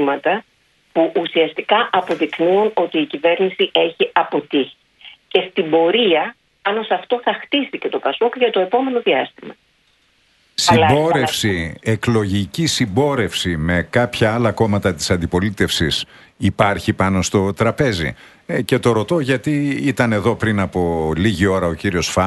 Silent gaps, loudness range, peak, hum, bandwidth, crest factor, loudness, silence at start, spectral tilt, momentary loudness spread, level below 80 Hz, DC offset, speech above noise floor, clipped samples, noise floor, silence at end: none; 2 LU; 0 dBFS; none; 12.5 kHz; 18 dB; -18 LUFS; 0 s; -5 dB/octave; 6 LU; -42 dBFS; under 0.1%; 42 dB; under 0.1%; -59 dBFS; 0 s